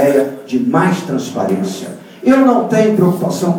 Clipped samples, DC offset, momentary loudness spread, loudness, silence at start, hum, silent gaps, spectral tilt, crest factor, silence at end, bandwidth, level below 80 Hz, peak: under 0.1%; under 0.1%; 9 LU; -14 LUFS; 0 s; none; none; -6.5 dB/octave; 14 dB; 0 s; 19.5 kHz; -60 dBFS; 0 dBFS